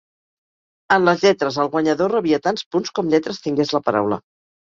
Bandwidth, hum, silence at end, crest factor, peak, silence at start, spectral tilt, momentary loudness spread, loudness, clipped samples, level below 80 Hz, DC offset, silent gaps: 7.6 kHz; none; 0.5 s; 18 dB; -2 dBFS; 0.9 s; -5.5 dB/octave; 7 LU; -19 LUFS; under 0.1%; -60 dBFS; under 0.1%; 2.66-2.71 s